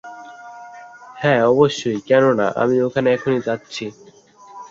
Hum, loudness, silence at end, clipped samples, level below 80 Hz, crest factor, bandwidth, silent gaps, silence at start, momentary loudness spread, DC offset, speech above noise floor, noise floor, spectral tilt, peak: none; -17 LUFS; 0.05 s; under 0.1%; -60 dBFS; 18 dB; 7.8 kHz; none; 0.05 s; 23 LU; under 0.1%; 29 dB; -46 dBFS; -6 dB/octave; -2 dBFS